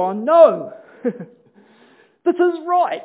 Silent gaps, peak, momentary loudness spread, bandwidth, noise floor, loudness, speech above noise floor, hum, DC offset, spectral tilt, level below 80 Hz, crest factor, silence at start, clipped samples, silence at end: none; 0 dBFS; 17 LU; 4 kHz; -52 dBFS; -17 LUFS; 36 dB; none; under 0.1%; -10 dB/octave; -86 dBFS; 18 dB; 0 s; under 0.1%; 0 s